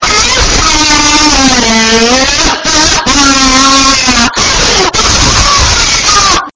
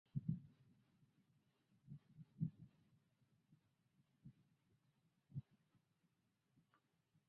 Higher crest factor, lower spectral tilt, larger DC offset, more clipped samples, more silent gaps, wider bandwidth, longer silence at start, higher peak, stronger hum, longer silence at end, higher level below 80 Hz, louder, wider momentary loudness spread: second, 6 dB vs 26 dB; second, -1.5 dB/octave vs -11.5 dB/octave; neither; first, 4% vs under 0.1%; neither; first, 8 kHz vs 4.4 kHz; second, 0 s vs 0.15 s; first, 0 dBFS vs -30 dBFS; neither; second, 0.05 s vs 1.85 s; first, -18 dBFS vs -80 dBFS; first, -5 LUFS vs -52 LUFS; second, 2 LU vs 20 LU